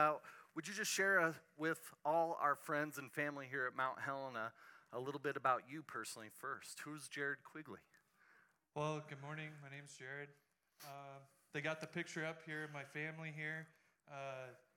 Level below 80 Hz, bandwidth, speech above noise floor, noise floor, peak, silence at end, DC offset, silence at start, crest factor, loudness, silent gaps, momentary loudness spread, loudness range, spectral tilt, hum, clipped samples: under -90 dBFS; 18 kHz; 29 dB; -73 dBFS; -22 dBFS; 0.2 s; under 0.1%; 0 s; 22 dB; -43 LUFS; none; 17 LU; 10 LU; -4 dB/octave; none; under 0.1%